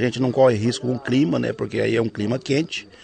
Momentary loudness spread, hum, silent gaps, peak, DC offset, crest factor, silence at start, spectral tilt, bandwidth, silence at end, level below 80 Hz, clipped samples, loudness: 8 LU; none; none; -4 dBFS; under 0.1%; 16 dB; 0 s; -6 dB/octave; 9.2 kHz; 0.2 s; -58 dBFS; under 0.1%; -21 LUFS